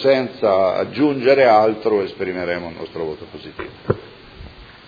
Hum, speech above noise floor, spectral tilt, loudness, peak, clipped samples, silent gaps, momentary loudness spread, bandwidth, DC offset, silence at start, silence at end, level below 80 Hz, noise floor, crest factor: none; 21 dB; -7.5 dB/octave; -18 LUFS; -2 dBFS; under 0.1%; none; 19 LU; 5 kHz; under 0.1%; 0 s; 0.2 s; -50 dBFS; -39 dBFS; 18 dB